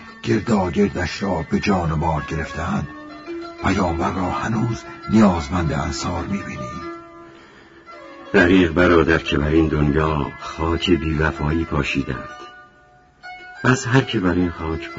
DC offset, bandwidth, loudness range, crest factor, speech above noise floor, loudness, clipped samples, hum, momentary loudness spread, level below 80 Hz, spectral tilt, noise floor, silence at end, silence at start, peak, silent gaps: under 0.1%; 8 kHz; 5 LU; 20 dB; 32 dB; -20 LUFS; under 0.1%; none; 17 LU; -34 dBFS; -6 dB/octave; -51 dBFS; 0 s; 0 s; 0 dBFS; none